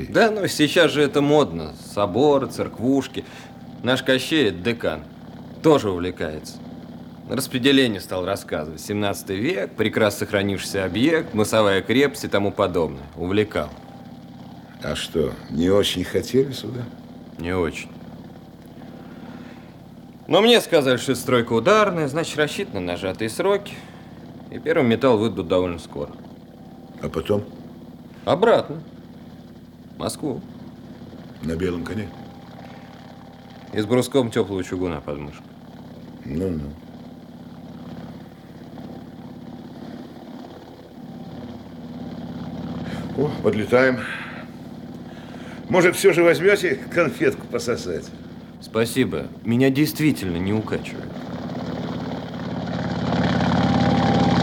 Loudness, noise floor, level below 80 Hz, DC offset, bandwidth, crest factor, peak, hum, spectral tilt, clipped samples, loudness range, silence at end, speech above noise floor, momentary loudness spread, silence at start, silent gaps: -21 LUFS; -42 dBFS; -52 dBFS; under 0.1%; 18.5 kHz; 20 dB; -2 dBFS; none; -5.5 dB/octave; under 0.1%; 13 LU; 0 s; 22 dB; 23 LU; 0 s; none